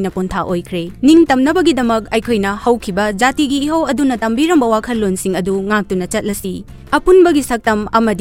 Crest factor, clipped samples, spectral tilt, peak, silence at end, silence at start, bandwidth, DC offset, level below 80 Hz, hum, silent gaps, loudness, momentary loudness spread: 14 dB; under 0.1%; -5 dB/octave; 0 dBFS; 0 s; 0 s; 16.5 kHz; under 0.1%; -36 dBFS; none; none; -14 LUFS; 10 LU